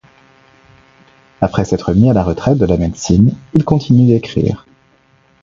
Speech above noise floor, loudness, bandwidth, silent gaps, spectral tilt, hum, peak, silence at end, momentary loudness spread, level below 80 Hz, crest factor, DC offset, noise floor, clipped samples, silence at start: 40 dB; -13 LUFS; 7.6 kHz; none; -7.5 dB/octave; none; 0 dBFS; 0.85 s; 7 LU; -32 dBFS; 14 dB; under 0.1%; -52 dBFS; under 0.1%; 1.4 s